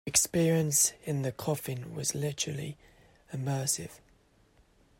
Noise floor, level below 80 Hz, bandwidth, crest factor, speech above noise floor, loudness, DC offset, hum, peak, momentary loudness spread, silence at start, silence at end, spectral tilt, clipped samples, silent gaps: -64 dBFS; -62 dBFS; 16.5 kHz; 24 dB; 34 dB; -30 LUFS; under 0.1%; none; -10 dBFS; 14 LU; 0.05 s; 1 s; -3.5 dB/octave; under 0.1%; none